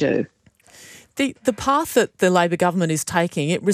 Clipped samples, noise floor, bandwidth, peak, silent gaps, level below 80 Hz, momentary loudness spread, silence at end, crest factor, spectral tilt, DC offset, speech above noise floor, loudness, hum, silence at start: under 0.1%; -49 dBFS; 15.5 kHz; -4 dBFS; none; -56 dBFS; 7 LU; 0 s; 16 dB; -5 dB/octave; under 0.1%; 29 dB; -20 LUFS; none; 0 s